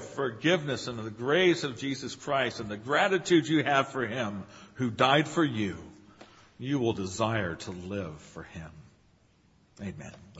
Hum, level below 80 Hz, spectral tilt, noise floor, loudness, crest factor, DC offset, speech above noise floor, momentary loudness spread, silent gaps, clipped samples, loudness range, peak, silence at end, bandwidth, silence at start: none; -62 dBFS; -5 dB/octave; -64 dBFS; -28 LUFS; 24 dB; under 0.1%; 35 dB; 19 LU; none; under 0.1%; 7 LU; -6 dBFS; 0 s; 8 kHz; 0 s